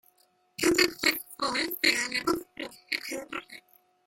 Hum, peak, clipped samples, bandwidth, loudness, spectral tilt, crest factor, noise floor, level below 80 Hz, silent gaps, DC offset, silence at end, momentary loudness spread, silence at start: none; -6 dBFS; under 0.1%; 17 kHz; -27 LUFS; -1.5 dB/octave; 24 dB; -67 dBFS; -62 dBFS; none; under 0.1%; 0.5 s; 17 LU; 0.6 s